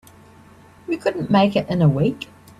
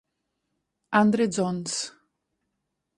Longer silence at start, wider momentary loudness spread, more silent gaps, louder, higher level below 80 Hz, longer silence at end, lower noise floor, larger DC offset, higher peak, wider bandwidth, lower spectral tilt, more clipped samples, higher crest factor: about the same, 0.9 s vs 0.9 s; first, 14 LU vs 10 LU; neither; first, -19 LUFS vs -25 LUFS; first, -54 dBFS vs -68 dBFS; second, 0.35 s vs 1.1 s; second, -47 dBFS vs -80 dBFS; neither; first, -4 dBFS vs -8 dBFS; first, 12.5 kHz vs 11 kHz; first, -8 dB/octave vs -4.5 dB/octave; neither; about the same, 16 dB vs 20 dB